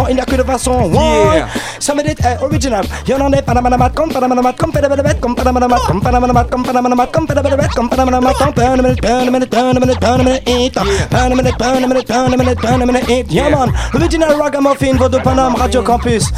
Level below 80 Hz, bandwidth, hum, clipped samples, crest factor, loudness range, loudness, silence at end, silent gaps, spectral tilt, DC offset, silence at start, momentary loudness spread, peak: -24 dBFS; 15.5 kHz; none; under 0.1%; 12 dB; 1 LU; -12 LUFS; 0 s; none; -5.5 dB/octave; under 0.1%; 0 s; 3 LU; 0 dBFS